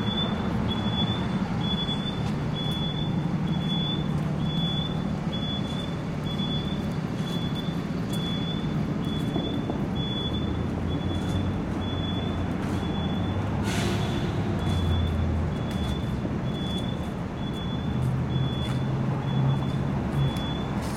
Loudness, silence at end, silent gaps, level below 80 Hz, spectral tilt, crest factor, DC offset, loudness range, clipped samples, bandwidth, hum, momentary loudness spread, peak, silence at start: -28 LUFS; 0 s; none; -40 dBFS; -6.5 dB/octave; 14 dB; under 0.1%; 2 LU; under 0.1%; 14.5 kHz; none; 3 LU; -14 dBFS; 0 s